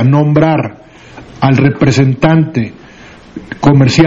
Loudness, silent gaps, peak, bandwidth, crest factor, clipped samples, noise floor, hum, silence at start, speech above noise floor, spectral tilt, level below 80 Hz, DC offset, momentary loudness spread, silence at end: -10 LUFS; none; 0 dBFS; 7.8 kHz; 10 dB; 0.3%; -36 dBFS; none; 0 s; 26 dB; -7 dB/octave; -38 dBFS; under 0.1%; 15 LU; 0 s